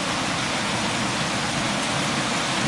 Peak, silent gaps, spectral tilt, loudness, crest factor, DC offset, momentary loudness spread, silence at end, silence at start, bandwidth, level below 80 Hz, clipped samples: -12 dBFS; none; -3 dB/octave; -23 LUFS; 12 dB; under 0.1%; 1 LU; 0 s; 0 s; 11.5 kHz; -50 dBFS; under 0.1%